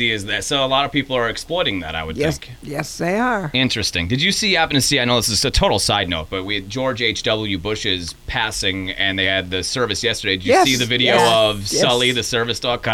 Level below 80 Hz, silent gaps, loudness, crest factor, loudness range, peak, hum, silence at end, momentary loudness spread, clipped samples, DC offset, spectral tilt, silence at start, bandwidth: -36 dBFS; none; -18 LUFS; 14 dB; 4 LU; -4 dBFS; none; 0 s; 9 LU; under 0.1%; under 0.1%; -3 dB/octave; 0 s; 18.5 kHz